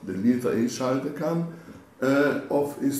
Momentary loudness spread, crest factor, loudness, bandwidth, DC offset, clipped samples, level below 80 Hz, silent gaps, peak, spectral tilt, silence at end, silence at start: 7 LU; 14 dB; -26 LUFS; 15.5 kHz; under 0.1%; under 0.1%; -68 dBFS; none; -10 dBFS; -6 dB/octave; 0 s; 0 s